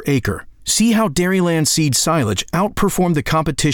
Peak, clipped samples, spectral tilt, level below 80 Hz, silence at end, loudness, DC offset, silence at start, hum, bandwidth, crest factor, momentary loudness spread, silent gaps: -6 dBFS; under 0.1%; -4.5 dB/octave; -36 dBFS; 0 s; -17 LUFS; under 0.1%; 0 s; none; over 20 kHz; 10 dB; 5 LU; none